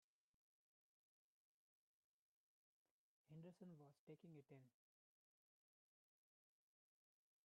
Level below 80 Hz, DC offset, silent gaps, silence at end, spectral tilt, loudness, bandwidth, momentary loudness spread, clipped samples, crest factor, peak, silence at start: under -90 dBFS; under 0.1%; 3.99-4.07 s; 2.75 s; -8.5 dB/octave; -65 LUFS; 3.8 kHz; 4 LU; under 0.1%; 20 dB; -52 dBFS; 3.3 s